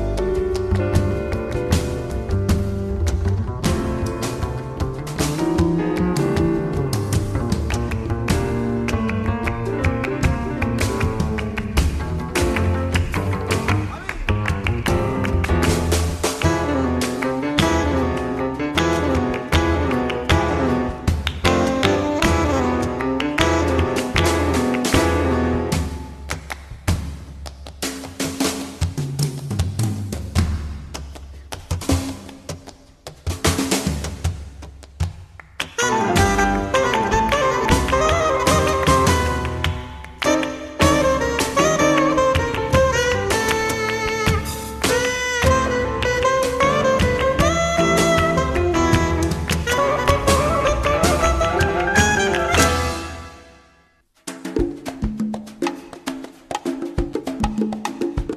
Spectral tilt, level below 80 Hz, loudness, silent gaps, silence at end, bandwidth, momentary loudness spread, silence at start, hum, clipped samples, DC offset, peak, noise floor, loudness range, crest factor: -5 dB/octave; -30 dBFS; -20 LUFS; none; 0 s; 13.5 kHz; 11 LU; 0 s; none; under 0.1%; under 0.1%; -2 dBFS; -58 dBFS; 8 LU; 18 dB